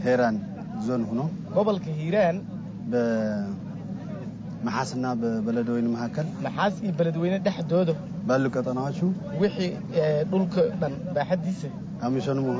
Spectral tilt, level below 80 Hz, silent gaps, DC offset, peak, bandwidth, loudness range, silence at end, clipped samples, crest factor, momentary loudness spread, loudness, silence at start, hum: -7.5 dB/octave; -58 dBFS; none; under 0.1%; -12 dBFS; 8 kHz; 3 LU; 0 s; under 0.1%; 14 dB; 9 LU; -27 LUFS; 0 s; none